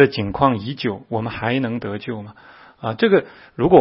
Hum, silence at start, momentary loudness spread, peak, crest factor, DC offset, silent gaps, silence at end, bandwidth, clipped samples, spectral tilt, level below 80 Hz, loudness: none; 0 s; 14 LU; 0 dBFS; 20 dB; under 0.1%; none; 0 s; 5.8 kHz; under 0.1%; -10 dB/octave; -48 dBFS; -21 LUFS